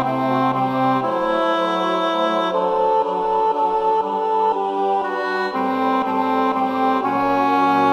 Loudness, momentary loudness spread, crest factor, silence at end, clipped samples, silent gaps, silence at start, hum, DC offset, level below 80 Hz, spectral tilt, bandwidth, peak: -19 LUFS; 2 LU; 14 dB; 0 s; under 0.1%; none; 0 s; none; under 0.1%; -56 dBFS; -6.5 dB/octave; 14 kHz; -4 dBFS